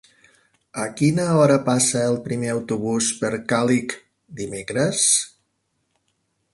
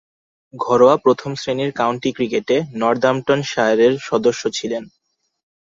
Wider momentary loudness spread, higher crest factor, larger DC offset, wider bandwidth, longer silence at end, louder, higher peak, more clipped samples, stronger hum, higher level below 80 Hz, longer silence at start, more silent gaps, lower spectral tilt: first, 15 LU vs 10 LU; about the same, 20 dB vs 16 dB; neither; first, 11.5 kHz vs 7.8 kHz; first, 1.25 s vs 0.8 s; about the same, -20 LUFS vs -18 LUFS; about the same, -4 dBFS vs -2 dBFS; neither; neither; about the same, -60 dBFS vs -60 dBFS; first, 0.75 s vs 0.55 s; neither; about the same, -4 dB/octave vs -5 dB/octave